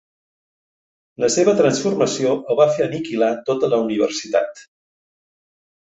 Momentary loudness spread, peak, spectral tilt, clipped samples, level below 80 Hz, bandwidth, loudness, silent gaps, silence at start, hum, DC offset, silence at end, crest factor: 6 LU; -2 dBFS; -4.5 dB/octave; under 0.1%; -64 dBFS; 8.4 kHz; -19 LUFS; none; 1.2 s; none; under 0.1%; 1.2 s; 18 dB